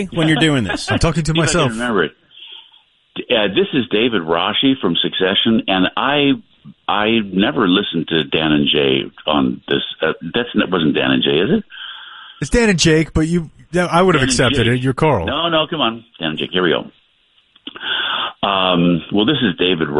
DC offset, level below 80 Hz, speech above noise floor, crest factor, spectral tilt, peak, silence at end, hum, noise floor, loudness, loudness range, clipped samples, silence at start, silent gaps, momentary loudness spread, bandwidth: under 0.1%; -38 dBFS; 41 dB; 16 dB; -4.5 dB/octave; 0 dBFS; 0 s; none; -57 dBFS; -16 LUFS; 3 LU; under 0.1%; 0 s; none; 9 LU; 11.5 kHz